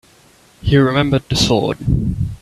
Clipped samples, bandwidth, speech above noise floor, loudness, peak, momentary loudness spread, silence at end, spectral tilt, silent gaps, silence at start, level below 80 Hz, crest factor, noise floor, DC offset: under 0.1%; 13 kHz; 34 dB; -16 LUFS; 0 dBFS; 6 LU; 0.05 s; -5.5 dB/octave; none; 0.65 s; -30 dBFS; 16 dB; -49 dBFS; under 0.1%